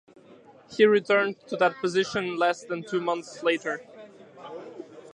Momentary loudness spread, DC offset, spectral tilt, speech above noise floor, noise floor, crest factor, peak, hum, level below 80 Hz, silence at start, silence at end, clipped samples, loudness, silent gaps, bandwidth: 21 LU; under 0.1%; -4.5 dB/octave; 27 dB; -52 dBFS; 20 dB; -8 dBFS; none; -72 dBFS; 0.3 s; 0 s; under 0.1%; -25 LUFS; none; 9.6 kHz